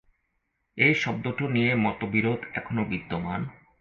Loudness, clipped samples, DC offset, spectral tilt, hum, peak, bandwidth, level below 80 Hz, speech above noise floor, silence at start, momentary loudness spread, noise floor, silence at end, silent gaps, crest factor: -26 LUFS; under 0.1%; under 0.1%; -7 dB/octave; none; -8 dBFS; 7.2 kHz; -56 dBFS; 50 dB; 0.75 s; 11 LU; -76 dBFS; 0.3 s; none; 20 dB